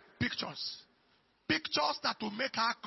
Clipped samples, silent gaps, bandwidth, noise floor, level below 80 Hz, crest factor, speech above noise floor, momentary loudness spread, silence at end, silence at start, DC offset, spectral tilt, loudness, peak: under 0.1%; none; 6 kHz; -71 dBFS; -68 dBFS; 18 dB; 36 dB; 10 LU; 0 s; 0.2 s; under 0.1%; -1.5 dB/octave; -34 LUFS; -18 dBFS